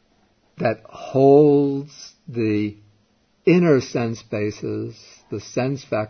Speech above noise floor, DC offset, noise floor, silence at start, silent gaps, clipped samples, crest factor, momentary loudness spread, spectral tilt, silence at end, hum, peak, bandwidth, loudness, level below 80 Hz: 42 dB; under 0.1%; -62 dBFS; 0.6 s; none; under 0.1%; 18 dB; 18 LU; -7.5 dB/octave; 0 s; none; -2 dBFS; 6.6 kHz; -20 LUFS; -60 dBFS